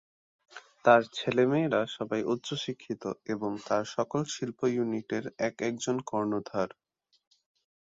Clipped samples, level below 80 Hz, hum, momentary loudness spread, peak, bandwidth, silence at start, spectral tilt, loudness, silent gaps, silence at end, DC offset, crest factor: under 0.1%; -72 dBFS; none; 11 LU; -8 dBFS; 7.8 kHz; 0.55 s; -5 dB/octave; -30 LUFS; none; 1.25 s; under 0.1%; 22 dB